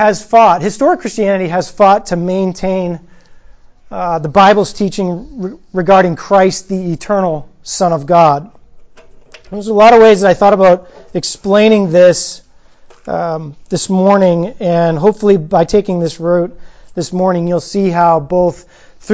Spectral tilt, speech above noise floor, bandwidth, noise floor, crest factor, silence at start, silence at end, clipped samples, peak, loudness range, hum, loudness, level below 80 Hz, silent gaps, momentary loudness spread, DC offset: -5.5 dB/octave; 29 dB; 8 kHz; -40 dBFS; 12 dB; 0 s; 0 s; under 0.1%; 0 dBFS; 5 LU; none; -11 LUFS; -42 dBFS; none; 14 LU; under 0.1%